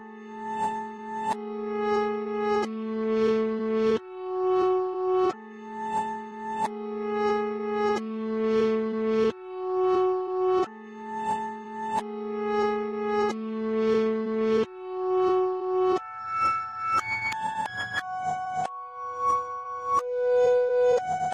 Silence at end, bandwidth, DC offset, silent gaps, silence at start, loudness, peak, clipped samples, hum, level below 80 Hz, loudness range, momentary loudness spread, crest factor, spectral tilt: 0 s; 10.5 kHz; under 0.1%; none; 0 s; -27 LUFS; -14 dBFS; under 0.1%; none; -64 dBFS; 3 LU; 10 LU; 12 dB; -5.5 dB/octave